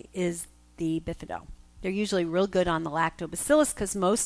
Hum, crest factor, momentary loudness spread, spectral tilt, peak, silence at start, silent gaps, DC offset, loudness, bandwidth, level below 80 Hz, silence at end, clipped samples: none; 18 dB; 14 LU; -4.5 dB/octave; -10 dBFS; 0.15 s; none; under 0.1%; -28 LUFS; 11 kHz; -50 dBFS; 0 s; under 0.1%